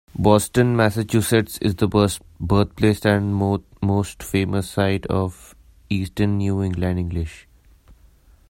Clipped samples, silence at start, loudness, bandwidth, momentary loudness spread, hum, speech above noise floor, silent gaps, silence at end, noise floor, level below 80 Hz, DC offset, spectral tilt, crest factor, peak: under 0.1%; 0.15 s; -21 LUFS; 16.5 kHz; 8 LU; none; 32 dB; none; 0.55 s; -52 dBFS; -42 dBFS; under 0.1%; -6 dB/octave; 20 dB; 0 dBFS